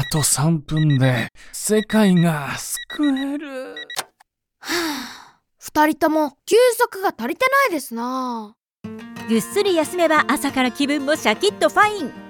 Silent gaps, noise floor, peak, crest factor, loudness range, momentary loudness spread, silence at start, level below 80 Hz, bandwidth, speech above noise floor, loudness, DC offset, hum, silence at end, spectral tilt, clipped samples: none; -60 dBFS; -2 dBFS; 18 dB; 5 LU; 14 LU; 0 s; -50 dBFS; 19 kHz; 41 dB; -19 LUFS; under 0.1%; none; 0 s; -4.5 dB/octave; under 0.1%